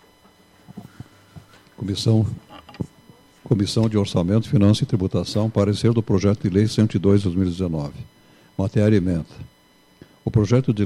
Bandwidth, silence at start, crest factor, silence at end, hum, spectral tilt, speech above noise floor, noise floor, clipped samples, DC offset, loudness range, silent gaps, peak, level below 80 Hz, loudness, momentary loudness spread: 12 kHz; 0.7 s; 16 dB; 0 s; none; -7.5 dB/octave; 36 dB; -55 dBFS; under 0.1%; under 0.1%; 6 LU; none; -6 dBFS; -48 dBFS; -20 LUFS; 16 LU